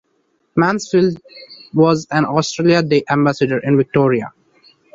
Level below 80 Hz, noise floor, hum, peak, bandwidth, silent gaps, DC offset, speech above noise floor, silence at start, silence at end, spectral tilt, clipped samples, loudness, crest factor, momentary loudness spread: -54 dBFS; -64 dBFS; none; 0 dBFS; 7.8 kHz; none; under 0.1%; 49 dB; 0.55 s; 0.65 s; -6 dB/octave; under 0.1%; -16 LUFS; 16 dB; 8 LU